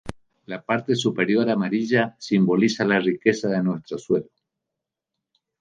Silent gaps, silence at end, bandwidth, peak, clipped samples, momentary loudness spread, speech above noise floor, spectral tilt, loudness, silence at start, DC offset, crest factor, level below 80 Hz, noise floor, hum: none; 1.35 s; 9.6 kHz; -4 dBFS; under 0.1%; 7 LU; 63 dB; -6 dB/octave; -22 LUFS; 0.05 s; under 0.1%; 20 dB; -58 dBFS; -85 dBFS; none